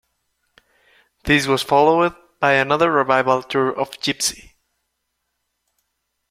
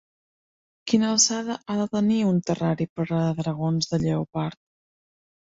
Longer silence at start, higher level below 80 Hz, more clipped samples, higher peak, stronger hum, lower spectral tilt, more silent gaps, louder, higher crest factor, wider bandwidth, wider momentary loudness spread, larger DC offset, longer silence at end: first, 1.25 s vs 0.85 s; first, -48 dBFS vs -58 dBFS; neither; first, -2 dBFS vs -6 dBFS; neither; about the same, -3.5 dB/octave vs -4.5 dB/octave; second, none vs 2.89-2.96 s; first, -18 LUFS vs -24 LUFS; about the same, 18 dB vs 20 dB; first, 16 kHz vs 7.8 kHz; second, 7 LU vs 10 LU; neither; first, 1.95 s vs 0.9 s